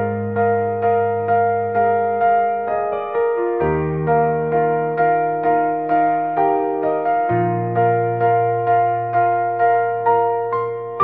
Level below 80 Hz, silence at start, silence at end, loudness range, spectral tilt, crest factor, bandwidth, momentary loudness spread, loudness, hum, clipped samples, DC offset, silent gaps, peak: -52 dBFS; 0 s; 0 s; 1 LU; -7.5 dB/octave; 12 dB; 3.8 kHz; 3 LU; -18 LUFS; none; under 0.1%; 0.2%; none; -4 dBFS